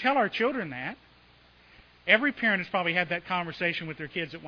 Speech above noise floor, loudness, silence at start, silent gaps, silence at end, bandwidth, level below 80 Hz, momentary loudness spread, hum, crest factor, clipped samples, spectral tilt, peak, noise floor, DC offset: 30 dB; -27 LUFS; 0 s; none; 0 s; 5.4 kHz; -66 dBFS; 13 LU; none; 24 dB; under 0.1%; -6.5 dB/octave; -6 dBFS; -58 dBFS; under 0.1%